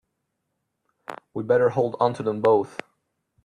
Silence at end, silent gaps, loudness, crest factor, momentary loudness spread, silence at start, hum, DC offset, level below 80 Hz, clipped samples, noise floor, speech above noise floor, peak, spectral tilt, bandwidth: 0.8 s; none; -22 LUFS; 20 dB; 20 LU; 1.1 s; none; under 0.1%; -68 dBFS; under 0.1%; -78 dBFS; 56 dB; -6 dBFS; -7.5 dB/octave; 10.5 kHz